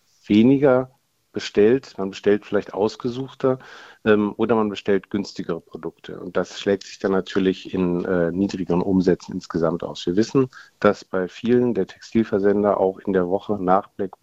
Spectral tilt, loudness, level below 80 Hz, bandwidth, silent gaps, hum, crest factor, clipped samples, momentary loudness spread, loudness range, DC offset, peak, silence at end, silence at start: -7 dB/octave; -22 LUFS; -54 dBFS; 8 kHz; none; none; 20 dB; under 0.1%; 10 LU; 3 LU; under 0.1%; -2 dBFS; 0.15 s; 0.3 s